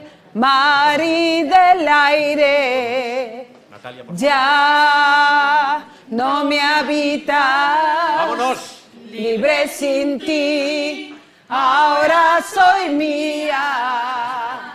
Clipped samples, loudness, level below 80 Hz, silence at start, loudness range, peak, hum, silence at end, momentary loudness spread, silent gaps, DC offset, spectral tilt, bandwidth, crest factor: under 0.1%; -15 LUFS; -62 dBFS; 0 s; 4 LU; -2 dBFS; none; 0 s; 13 LU; none; under 0.1%; -3 dB/octave; 15 kHz; 14 dB